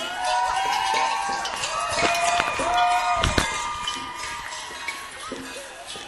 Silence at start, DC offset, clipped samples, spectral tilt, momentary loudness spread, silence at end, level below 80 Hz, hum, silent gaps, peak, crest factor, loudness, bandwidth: 0 s; under 0.1%; under 0.1%; -2 dB/octave; 13 LU; 0 s; -42 dBFS; none; none; 0 dBFS; 24 dB; -24 LUFS; 15 kHz